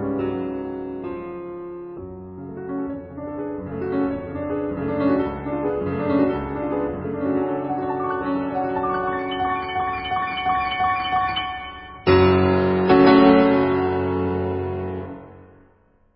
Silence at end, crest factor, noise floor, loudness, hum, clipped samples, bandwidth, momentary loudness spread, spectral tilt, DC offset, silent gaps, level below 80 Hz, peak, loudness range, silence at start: 0.7 s; 20 dB; -57 dBFS; -22 LUFS; none; under 0.1%; 5.6 kHz; 17 LU; -11.5 dB/octave; under 0.1%; none; -42 dBFS; -2 dBFS; 12 LU; 0 s